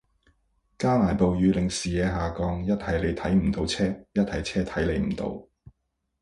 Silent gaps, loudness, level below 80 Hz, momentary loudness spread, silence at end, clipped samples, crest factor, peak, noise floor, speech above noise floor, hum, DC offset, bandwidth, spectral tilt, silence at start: none; -26 LUFS; -40 dBFS; 6 LU; 0.5 s; under 0.1%; 18 dB; -8 dBFS; -77 dBFS; 52 dB; none; under 0.1%; 11.5 kHz; -6 dB/octave; 0.8 s